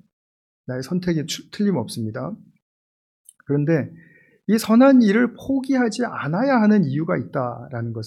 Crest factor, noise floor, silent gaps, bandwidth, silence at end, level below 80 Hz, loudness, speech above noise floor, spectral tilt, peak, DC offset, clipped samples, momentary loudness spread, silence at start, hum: 16 dB; under -90 dBFS; 2.62-3.25 s; 14.5 kHz; 0 s; -60 dBFS; -20 LUFS; over 70 dB; -6.5 dB/octave; -6 dBFS; under 0.1%; under 0.1%; 16 LU; 0.7 s; none